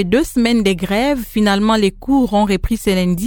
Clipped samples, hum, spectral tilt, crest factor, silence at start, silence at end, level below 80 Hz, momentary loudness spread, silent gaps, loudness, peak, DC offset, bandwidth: under 0.1%; none; -5.5 dB/octave; 14 dB; 0 s; 0 s; -30 dBFS; 3 LU; none; -15 LUFS; 0 dBFS; under 0.1%; 18 kHz